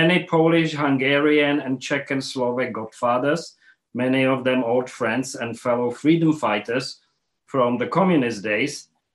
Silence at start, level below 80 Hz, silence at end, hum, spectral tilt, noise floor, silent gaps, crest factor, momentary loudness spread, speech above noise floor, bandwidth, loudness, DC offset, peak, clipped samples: 0 s; -68 dBFS; 0.3 s; none; -5.5 dB/octave; -61 dBFS; none; 16 dB; 9 LU; 40 dB; 12 kHz; -21 LUFS; under 0.1%; -6 dBFS; under 0.1%